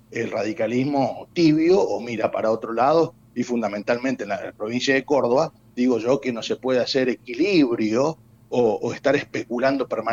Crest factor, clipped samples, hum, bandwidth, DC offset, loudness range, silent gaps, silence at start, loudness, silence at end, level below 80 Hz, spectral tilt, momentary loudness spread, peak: 16 dB; under 0.1%; none; 7.6 kHz; under 0.1%; 2 LU; none; 0.1 s; -22 LUFS; 0 s; -62 dBFS; -5.5 dB/octave; 8 LU; -6 dBFS